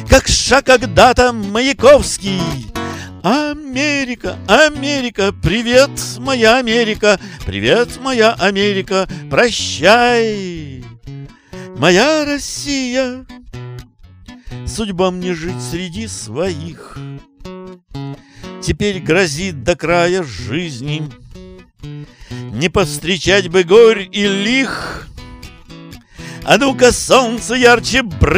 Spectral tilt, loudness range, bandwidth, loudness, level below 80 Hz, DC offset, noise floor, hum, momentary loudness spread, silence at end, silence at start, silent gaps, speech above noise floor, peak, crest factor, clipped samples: -4 dB/octave; 9 LU; 16.5 kHz; -14 LUFS; -32 dBFS; under 0.1%; -39 dBFS; none; 22 LU; 0 s; 0 s; none; 25 dB; 0 dBFS; 14 dB; 0.1%